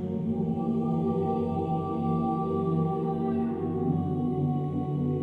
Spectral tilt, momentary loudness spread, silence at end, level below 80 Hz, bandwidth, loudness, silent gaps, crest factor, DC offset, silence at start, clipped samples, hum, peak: -11.5 dB/octave; 2 LU; 0 s; -56 dBFS; 4.1 kHz; -29 LUFS; none; 12 dB; under 0.1%; 0 s; under 0.1%; none; -16 dBFS